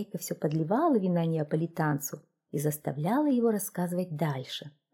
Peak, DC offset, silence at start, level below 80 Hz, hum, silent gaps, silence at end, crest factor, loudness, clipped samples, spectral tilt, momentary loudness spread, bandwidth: -14 dBFS; under 0.1%; 0 s; -74 dBFS; none; none; 0.25 s; 14 dB; -30 LUFS; under 0.1%; -6 dB/octave; 11 LU; 18.5 kHz